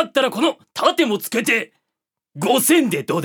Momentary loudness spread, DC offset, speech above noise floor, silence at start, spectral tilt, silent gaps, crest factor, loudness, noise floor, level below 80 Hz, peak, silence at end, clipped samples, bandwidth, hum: 6 LU; under 0.1%; 64 dB; 0 s; -3.5 dB/octave; none; 18 dB; -18 LUFS; -82 dBFS; -76 dBFS; -2 dBFS; 0 s; under 0.1%; 20 kHz; none